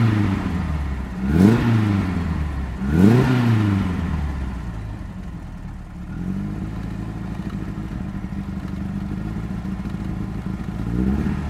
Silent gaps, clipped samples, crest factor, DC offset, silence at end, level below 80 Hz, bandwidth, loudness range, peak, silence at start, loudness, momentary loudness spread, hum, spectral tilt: none; under 0.1%; 20 dB; under 0.1%; 0 s; -32 dBFS; 13.5 kHz; 11 LU; 0 dBFS; 0 s; -23 LUFS; 16 LU; none; -8 dB/octave